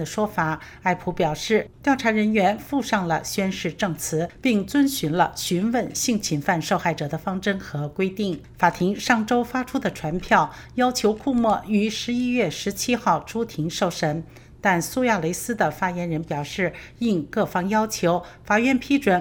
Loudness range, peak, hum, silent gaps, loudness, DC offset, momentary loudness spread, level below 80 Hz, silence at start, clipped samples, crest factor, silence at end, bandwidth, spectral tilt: 2 LU; -2 dBFS; none; none; -23 LUFS; under 0.1%; 7 LU; -50 dBFS; 0 s; under 0.1%; 20 dB; 0 s; over 20 kHz; -4.5 dB/octave